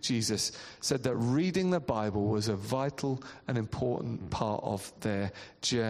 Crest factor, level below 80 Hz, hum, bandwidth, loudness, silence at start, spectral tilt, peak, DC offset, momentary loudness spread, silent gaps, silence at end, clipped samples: 16 dB; -58 dBFS; none; 14 kHz; -32 LUFS; 0 s; -5 dB/octave; -14 dBFS; under 0.1%; 7 LU; none; 0 s; under 0.1%